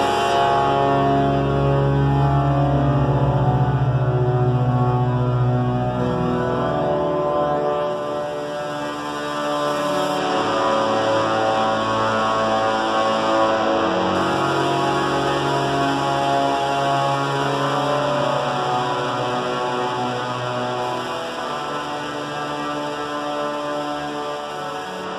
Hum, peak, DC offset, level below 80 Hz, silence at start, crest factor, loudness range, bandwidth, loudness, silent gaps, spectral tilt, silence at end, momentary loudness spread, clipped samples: none; -6 dBFS; under 0.1%; -40 dBFS; 0 s; 14 dB; 6 LU; 12.5 kHz; -20 LUFS; none; -6 dB/octave; 0 s; 8 LU; under 0.1%